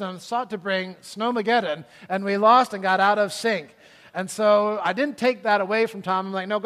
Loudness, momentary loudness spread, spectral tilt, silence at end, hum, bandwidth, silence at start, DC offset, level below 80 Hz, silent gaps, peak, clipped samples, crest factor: -22 LUFS; 12 LU; -4.5 dB/octave; 0 s; none; 15 kHz; 0 s; under 0.1%; -74 dBFS; none; -4 dBFS; under 0.1%; 20 dB